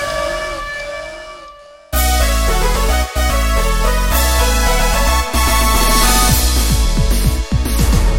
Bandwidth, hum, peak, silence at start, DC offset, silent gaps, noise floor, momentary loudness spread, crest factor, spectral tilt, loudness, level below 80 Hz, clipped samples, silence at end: 17 kHz; none; 0 dBFS; 0 s; under 0.1%; none; -38 dBFS; 11 LU; 14 dB; -3.5 dB/octave; -15 LUFS; -16 dBFS; under 0.1%; 0 s